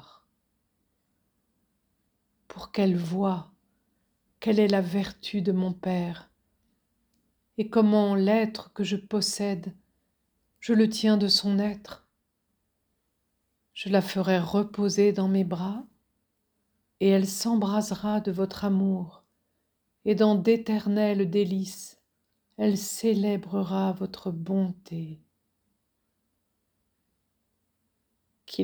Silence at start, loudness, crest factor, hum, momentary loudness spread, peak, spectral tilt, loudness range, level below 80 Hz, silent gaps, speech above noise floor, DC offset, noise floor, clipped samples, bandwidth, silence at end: 2.55 s; -26 LUFS; 18 dB; none; 15 LU; -10 dBFS; -6 dB/octave; 6 LU; -66 dBFS; none; 51 dB; under 0.1%; -77 dBFS; under 0.1%; over 20 kHz; 0 s